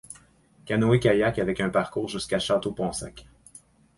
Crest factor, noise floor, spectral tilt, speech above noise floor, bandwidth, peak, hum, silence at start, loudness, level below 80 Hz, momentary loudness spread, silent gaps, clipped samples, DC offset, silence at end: 18 dB; -58 dBFS; -5.5 dB/octave; 33 dB; 11.5 kHz; -8 dBFS; none; 0.1 s; -25 LUFS; -52 dBFS; 16 LU; none; under 0.1%; under 0.1%; 0.75 s